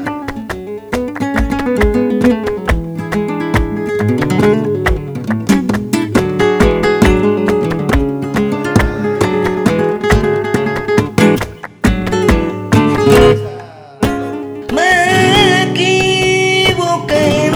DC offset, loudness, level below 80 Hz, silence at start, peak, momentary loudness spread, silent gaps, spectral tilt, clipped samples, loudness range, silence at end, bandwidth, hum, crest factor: under 0.1%; -13 LUFS; -24 dBFS; 0 s; 0 dBFS; 10 LU; none; -5.5 dB/octave; under 0.1%; 4 LU; 0 s; over 20 kHz; none; 12 dB